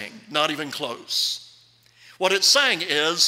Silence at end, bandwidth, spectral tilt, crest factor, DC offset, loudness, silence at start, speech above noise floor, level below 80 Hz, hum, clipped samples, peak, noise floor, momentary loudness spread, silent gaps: 0 s; 16 kHz; -0.5 dB/octave; 18 dB; under 0.1%; -21 LUFS; 0 s; 33 dB; -74 dBFS; none; under 0.1%; -6 dBFS; -55 dBFS; 13 LU; none